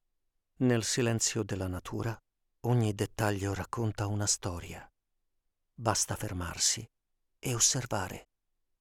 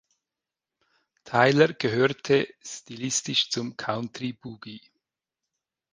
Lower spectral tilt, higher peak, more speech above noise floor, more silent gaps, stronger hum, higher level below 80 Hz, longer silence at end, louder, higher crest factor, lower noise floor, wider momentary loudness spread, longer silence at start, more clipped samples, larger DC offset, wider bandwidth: about the same, -3.5 dB/octave vs -4 dB/octave; second, -10 dBFS vs -4 dBFS; second, 48 dB vs 63 dB; neither; neither; first, -56 dBFS vs -68 dBFS; second, 0.6 s vs 1.15 s; second, -31 LUFS vs -25 LUFS; about the same, 22 dB vs 24 dB; second, -79 dBFS vs -89 dBFS; second, 13 LU vs 19 LU; second, 0.6 s vs 1.25 s; neither; neither; first, 17.5 kHz vs 10 kHz